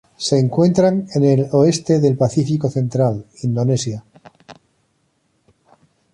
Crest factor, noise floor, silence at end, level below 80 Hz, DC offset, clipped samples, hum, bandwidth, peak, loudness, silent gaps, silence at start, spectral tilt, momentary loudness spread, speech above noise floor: 16 dB; -65 dBFS; 1.6 s; -54 dBFS; under 0.1%; under 0.1%; none; 11 kHz; -2 dBFS; -17 LUFS; none; 0.2 s; -7 dB/octave; 7 LU; 49 dB